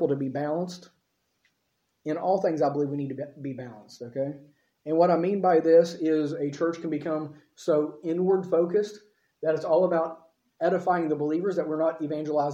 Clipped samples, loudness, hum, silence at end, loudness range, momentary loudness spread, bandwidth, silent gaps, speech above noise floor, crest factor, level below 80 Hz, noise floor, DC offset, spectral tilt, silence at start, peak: under 0.1%; -26 LUFS; none; 0 s; 6 LU; 14 LU; 8.2 kHz; none; 50 dB; 18 dB; -78 dBFS; -76 dBFS; under 0.1%; -7.5 dB/octave; 0 s; -10 dBFS